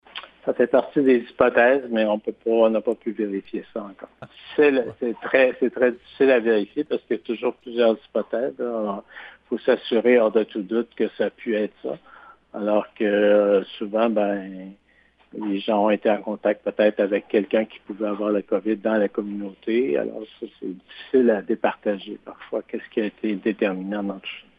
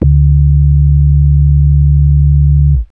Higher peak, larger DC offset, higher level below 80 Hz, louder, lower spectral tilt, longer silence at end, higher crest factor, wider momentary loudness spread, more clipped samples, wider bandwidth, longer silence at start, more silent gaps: about the same, 0 dBFS vs 0 dBFS; second, under 0.1% vs 0.4%; second, -66 dBFS vs -10 dBFS; second, -22 LUFS vs -9 LUFS; second, -8.5 dB/octave vs -15 dB/octave; first, 0.2 s vs 0.05 s; first, 22 dB vs 8 dB; first, 15 LU vs 0 LU; neither; first, 5 kHz vs 0.7 kHz; first, 0.15 s vs 0 s; neither